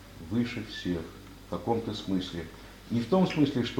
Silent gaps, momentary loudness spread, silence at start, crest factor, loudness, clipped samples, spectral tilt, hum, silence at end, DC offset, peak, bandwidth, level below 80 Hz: none; 17 LU; 0 s; 18 dB; -31 LUFS; under 0.1%; -6.5 dB/octave; none; 0 s; under 0.1%; -12 dBFS; 17.5 kHz; -52 dBFS